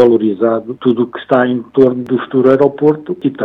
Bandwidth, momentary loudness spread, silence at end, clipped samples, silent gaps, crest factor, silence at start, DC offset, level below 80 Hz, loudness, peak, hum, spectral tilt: 5 kHz; 7 LU; 0 s; 0.7%; none; 12 dB; 0 s; under 0.1%; -58 dBFS; -13 LUFS; 0 dBFS; none; -9 dB/octave